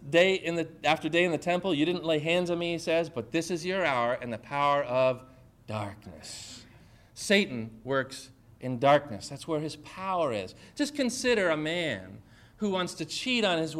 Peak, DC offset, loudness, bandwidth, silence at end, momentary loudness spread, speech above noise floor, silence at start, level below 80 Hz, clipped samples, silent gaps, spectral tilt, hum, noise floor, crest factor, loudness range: -8 dBFS; under 0.1%; -29 LUFS; 14.5 kHz; 0 s; 14 LU; 27 dB; 0 s; -62 dBFS; under 0.1%; none; -4.5 dB/octave; none; -55 dBFS; 22 dB; 4 LU